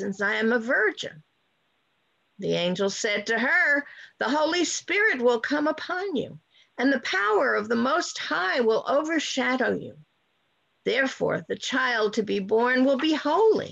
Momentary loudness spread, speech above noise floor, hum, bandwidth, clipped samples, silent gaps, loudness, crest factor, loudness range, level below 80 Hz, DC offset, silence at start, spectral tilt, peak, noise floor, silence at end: 9 LU; 47 dB; none; 8.4 kHz; under 0.1%; none; -24 LUFS; 14 dB; 3 LU; -70 dBFS; under 0.1%; 0 s; -3.5 dB/octave; -12 dBFS; -71 dBFS; 0 s